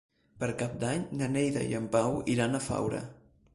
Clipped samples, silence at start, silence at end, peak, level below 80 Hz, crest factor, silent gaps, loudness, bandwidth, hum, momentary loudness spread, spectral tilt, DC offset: under 0.1%; 0.35 s; 0.4 s; -14 dBFS; -58 dBFS; 18 dB; none; -31 LUFS; 11.5 kHz; none; 7 LU; -5.5 dB/octave; under 0.1%